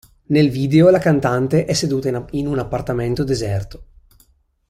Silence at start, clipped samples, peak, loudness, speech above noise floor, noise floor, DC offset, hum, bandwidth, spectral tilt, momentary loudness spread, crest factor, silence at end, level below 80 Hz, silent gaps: 0.3 s; under 0.1%; -2 dBFS; -18 LUFS; 40 dB; -57 dBFS; under 0.1%; none; 14.5 kHz; -6.5 dB/octave; 10 LU; 16 dB; 0.85 s; -40 dBFS; none